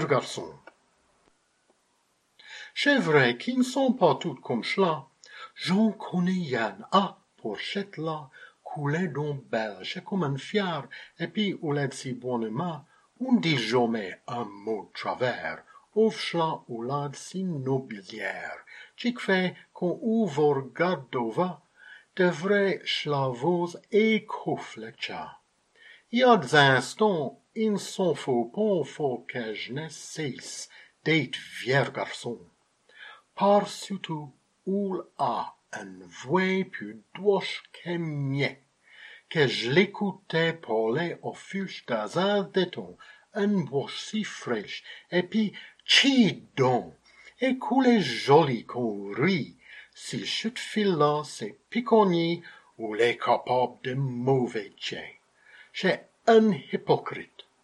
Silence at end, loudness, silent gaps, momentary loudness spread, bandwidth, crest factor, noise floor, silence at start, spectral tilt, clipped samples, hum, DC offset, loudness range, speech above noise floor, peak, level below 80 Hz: 0.4 s; -27 LUFS; none; 16 LU; 12.5 kHz; 24 dB; -70 dBFS; 0 s; -5.5 dB/octave; under 0.1%; none; under 0.1%; 6 LU; 44 dB; -4 dBFS; -74 dBFS